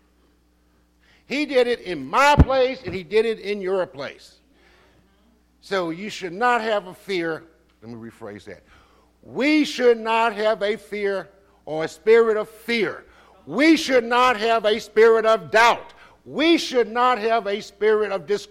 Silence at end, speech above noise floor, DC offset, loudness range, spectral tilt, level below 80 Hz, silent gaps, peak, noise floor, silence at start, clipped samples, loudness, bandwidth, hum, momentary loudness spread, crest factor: 0.05 s; 40 dB; under 0.1%; 9 LU; -5 dB/octave; -38 dBFS; none; -6 dBFS; -61 dBFS; 1.3 s; under 0.1%; -20 LUFS; 15.5 kHz; none; 15 LU; 16 dB